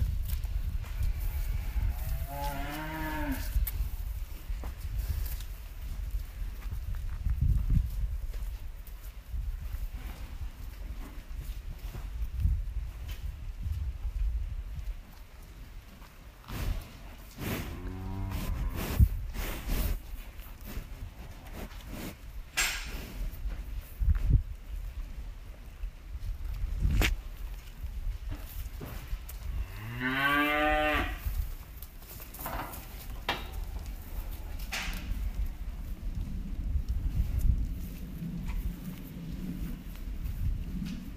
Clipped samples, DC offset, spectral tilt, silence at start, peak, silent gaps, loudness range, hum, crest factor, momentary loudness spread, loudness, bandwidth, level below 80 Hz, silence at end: under 0.1%; under 0.1%; -5 dB/octave; 0 s; -10 dBFS; none; 9 LU; none; 24 dB; 16 LU; -36 LUFS; 15.5 kHz; -36 dBFS; 0 s